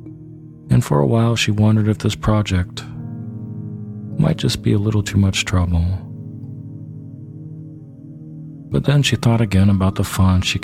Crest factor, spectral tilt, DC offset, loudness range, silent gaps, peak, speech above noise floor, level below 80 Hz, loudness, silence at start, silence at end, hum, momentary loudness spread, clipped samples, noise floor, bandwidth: 16 dB; -6 dB/octave; under 0.1%; 6 LU; none; -2 dBFS; 22 dB; -36 dBFS; -17 LUFS; 0 s; 0 s; none; 20 LU; under 0.1%; -38 dBFS; 15.5 kHz